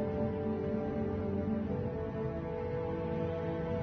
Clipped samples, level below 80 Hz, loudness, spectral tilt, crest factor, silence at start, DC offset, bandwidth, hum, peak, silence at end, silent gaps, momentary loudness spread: under 0.1%; -52 dBFS; -36 LUFS; -8.5 dB/octave; 12 dB; 0 s; under 0.1%; 6.2 kHz; none; -24 dBFS; 0 s; none; 3 LU